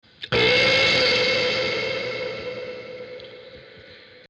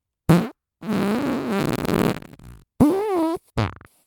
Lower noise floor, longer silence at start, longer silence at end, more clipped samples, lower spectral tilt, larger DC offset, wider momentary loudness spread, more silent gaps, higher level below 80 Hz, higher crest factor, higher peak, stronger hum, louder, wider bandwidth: about the same, -46 dBFS vs -45 dBFS; about the same, 0.2 s vs 0.3 s; second, 0.1 s vs 0.35 s; neither; second, -3 dB/octave vs -7 dB/octave; neither; first, 21 LU vs 9 LU; neither; second, -52 dBFS vs -44 dBFS; second, 16 dB vs 22 dB; second, -6 dBFS vs 0 dBFS; neither; about the same, -20 LUFS vs -22 LUFS; second, 10.5 kHz vs 19.5 kHz